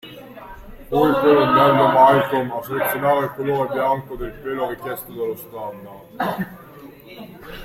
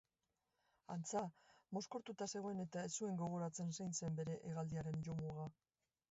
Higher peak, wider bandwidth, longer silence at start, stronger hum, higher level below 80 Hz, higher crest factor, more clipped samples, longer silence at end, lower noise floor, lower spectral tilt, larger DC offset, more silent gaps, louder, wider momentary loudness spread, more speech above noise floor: first, -2 dBFS vs -32 dBFS; first, 16.5 kHz vs 8 kHz; second, 0.05 s vs 0.9 s; neither; first, -46 dBFS vs -76 dBFS; about the same, 18 dB vs 16 dB; neither; second, 0 s vs 0.6 s; second, -41 dBFS vs under -90 dBFS; about the same, -6 dB/octave vs -7 dB/octave; neither; neither; first, -19 LUFS vs -47 LUFS; first, 25 LU vs 6 LU; second, 22 dB vs over 44 dB